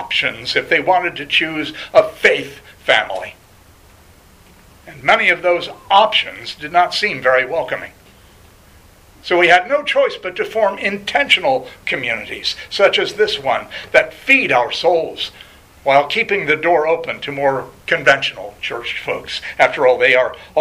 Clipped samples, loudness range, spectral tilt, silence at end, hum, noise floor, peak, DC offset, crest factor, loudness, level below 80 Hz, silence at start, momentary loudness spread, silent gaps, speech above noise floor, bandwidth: under 0.1%; 3 LU; -3.5 dB/octave; 0 s; none; -46 dBFS; 0 dBFS; under 0.1%; 18 dB; -16 LUFS; -52 dBFS; 0 s; 12 LU; none; 30 dB; 15.5 kHz